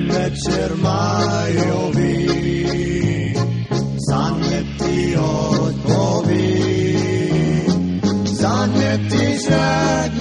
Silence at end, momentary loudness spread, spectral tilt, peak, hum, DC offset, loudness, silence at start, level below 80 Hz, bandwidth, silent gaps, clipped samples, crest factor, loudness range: 0 s; 3 LU; -6 dB/octave; -2 dBFS; none; under 0.1%; -18 LUFS; 0 s; -36 dBFS; 11.5 kHz; none; under 0.1%; 14 dB; 2 LU